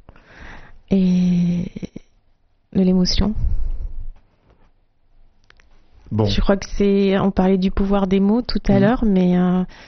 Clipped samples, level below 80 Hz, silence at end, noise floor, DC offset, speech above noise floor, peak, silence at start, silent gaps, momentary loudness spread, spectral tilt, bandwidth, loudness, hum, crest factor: under 0.1%; -28 dBFS; 0.15 s; -58 dBFS; under 0.1%; 42 dB; -2 dBFS; 0.4 s; none; 13 LU; -7 dB/octave; 6.4 kHz; -18 LUFS; none; 16 dB